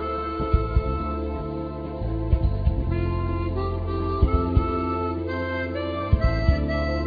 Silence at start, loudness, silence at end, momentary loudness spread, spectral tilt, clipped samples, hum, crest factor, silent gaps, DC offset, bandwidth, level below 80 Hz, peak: 0 s; -25 LUFS; 0 s; 7 LU; -9.5 dB/octave; under 0.1%; none; 18 dB; none; under 0.1%; 5 kHz; -28 dBFS; -6 dBFS